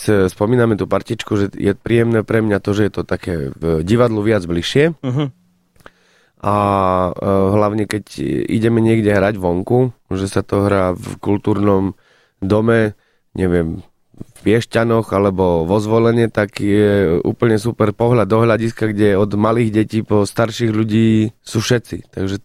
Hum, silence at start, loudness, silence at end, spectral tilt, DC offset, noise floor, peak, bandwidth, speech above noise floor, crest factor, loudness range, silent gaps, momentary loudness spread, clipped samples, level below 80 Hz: none; 0 s; -16 LUFS; 0.05 s; -7 dB/octave; under 0.1%; -55 dBFS; -2 dBFS; 14.5 kHz; 40 dB; 14 dB; 3 LU; none; 8 LU; under 0.1%; -42 dBFS